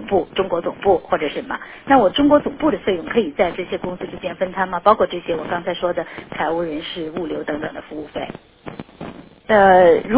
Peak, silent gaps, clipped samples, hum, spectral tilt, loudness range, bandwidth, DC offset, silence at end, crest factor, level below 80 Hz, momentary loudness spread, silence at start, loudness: 0 dBFS; none; under 0.1%; none; -9.5 dB/octave; 7 LU; 4 kHz; under 0.1%; 0 s; 18 dB; -48 dBFS; 18 LU; 0 s; -19 LUFS